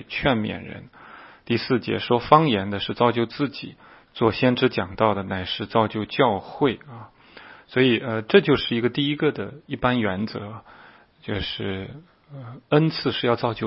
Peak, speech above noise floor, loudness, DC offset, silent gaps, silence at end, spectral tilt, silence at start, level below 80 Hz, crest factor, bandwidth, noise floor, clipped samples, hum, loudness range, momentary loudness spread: 0 dBFS; 24 dB; -22 LUFS; under 0.1%; none; 0 s; -10 dB/octave; 0 s; -52 dBFS; 24 dB; 5.8 kHz; -46 dBFS; under 0.1%; none; 5 LU; 20 LU